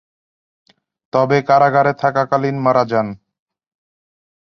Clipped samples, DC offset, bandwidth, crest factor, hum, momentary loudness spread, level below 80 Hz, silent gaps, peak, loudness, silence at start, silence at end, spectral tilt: under 0.1%; under 0.1%; 6.6 kHz; 18 dB; none; 8 LU; -60 dBFS; none; -2 dBFS; -16 LUFS; 1.15 s; 1.45 s; -7.5 dB/octave